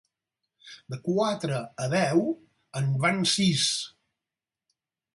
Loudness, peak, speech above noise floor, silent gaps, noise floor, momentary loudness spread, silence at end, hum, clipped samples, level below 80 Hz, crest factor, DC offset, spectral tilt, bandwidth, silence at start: -26 LUFS; -8 dBFS; 64 dB; none; -90 dBFS; 15 LU; 1.25 s; none; under 0.1%; -66 dBFS; 20 dB; under 0.1%; -4.5 dB/octave; 11.5 kHz; 0.65 s